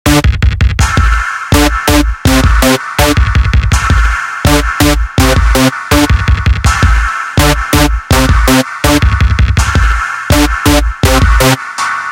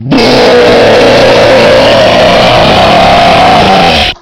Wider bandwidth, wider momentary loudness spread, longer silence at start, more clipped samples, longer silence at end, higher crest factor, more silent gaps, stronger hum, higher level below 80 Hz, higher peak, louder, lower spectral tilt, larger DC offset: about the same, 17 kHz vs 16.5 kHz; about the same, 3 LU vs 1 LU; about the same, 0.05 s vs 0 s; second, 0.8% vs 7%; about the same, 0 s vs 0.1 s; about the same, 8 dB vs 4 dB; neither; neither; first, -12 dBFS vs -24 dBFS; about the same, 0 dBFS vs 0 dBFS; second, -10 LUFS vs -3 LUFS; about the same, -4.5 dB/octave vs -4.5 dB/octave; second, under 0.1% vs 3%